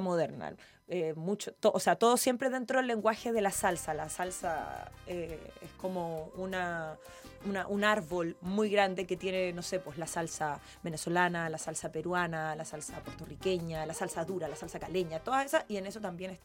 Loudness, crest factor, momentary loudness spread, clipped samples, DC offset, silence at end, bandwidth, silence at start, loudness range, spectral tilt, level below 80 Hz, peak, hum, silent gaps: -34 LUFS; 22 dB; 13 LU; under 0.1%; under 0.1%; 0.05 s; 17 kHz; 0 s; 6 LU; -4 dB/octave; -60 dBFS; -12 dBFS; none; none